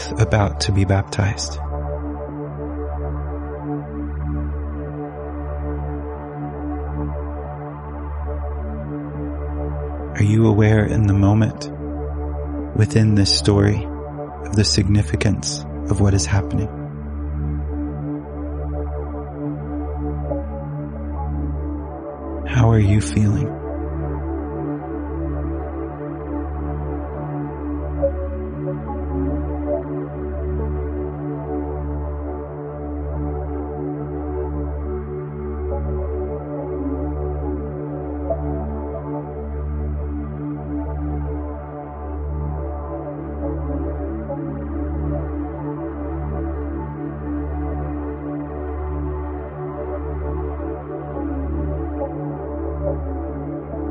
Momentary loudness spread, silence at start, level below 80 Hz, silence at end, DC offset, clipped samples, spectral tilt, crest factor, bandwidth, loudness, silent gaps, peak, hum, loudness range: 12 LU; 0 s; -28 dBFS; 0 s; under 0.1%; under 0.1%; -6.5 dB/octave; 20 dB; 10.5 kHz; -24 LUFS; none; -2 dBFS; none; 9 LU